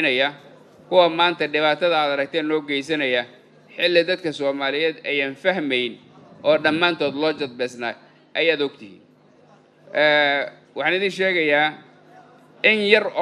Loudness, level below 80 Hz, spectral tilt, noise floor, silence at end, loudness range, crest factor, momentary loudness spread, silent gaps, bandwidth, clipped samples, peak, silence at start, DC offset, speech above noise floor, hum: -20 LUFS; -76 dBFS; -4.5 dB/octave; -53 dBFS; 0 s; 3 LU; 22 dB; 10 LU; none; 11.5 kHz; under 0.1%; 0 dBFS; 0 s; under 0.1%; 33 dB; none